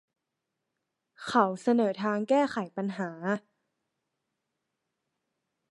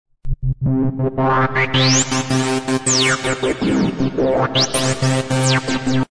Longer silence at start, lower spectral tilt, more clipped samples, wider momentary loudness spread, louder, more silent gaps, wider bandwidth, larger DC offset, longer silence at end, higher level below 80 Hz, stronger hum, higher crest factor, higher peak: first, 1.2 s vs 0.25 s; first, -6 dB/octave vs -4 dB/octave; neither; first, 8 LU vs 5 LU; second, -29 LUFS vs -17 LUFS; neither; about the same, 11.5 kHz vs 11 kHz; neither; first, 2.3 s vs 0.05 s; second, -80 dBFS vs -34 dBFS; neither; first, 24 dB vs 12 dB; second, -8 dBFS vs -4 dBFS